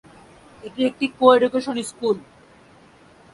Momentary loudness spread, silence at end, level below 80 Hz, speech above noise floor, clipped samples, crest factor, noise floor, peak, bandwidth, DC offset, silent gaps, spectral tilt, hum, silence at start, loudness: 14 LU; 1.15 s; -62 dBFS; 31 dB; under 0.1%; 22 dB; -50 dBFS; 0 dBFS; 11.5 kHz; under 0.1%; none; -4.5 dB/octave; none; 0.65 s; -20 LUFS